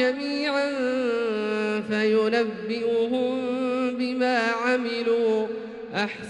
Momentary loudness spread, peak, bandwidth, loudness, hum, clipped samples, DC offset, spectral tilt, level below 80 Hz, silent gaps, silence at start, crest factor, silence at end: 5 LU; -10 dBFS; 10 kHz; -25 LUFS; none; under 0.1%; under 0.1%; -5 dB/octave; -68 dBFS; none; 0 s; 14 dB; 0 s